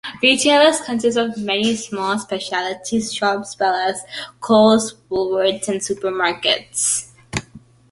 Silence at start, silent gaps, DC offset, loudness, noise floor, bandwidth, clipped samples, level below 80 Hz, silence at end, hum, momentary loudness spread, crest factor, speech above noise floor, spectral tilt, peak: 0.05 s; none; under 0.1%; -18 LUFS; -45 dBFS; 11.5 kHz; under 0.1%; -54 dBFS; 0.35 s; none; 11 LU; 18 dB; 27 dB; -2.5 dB/octave; 0 dBFS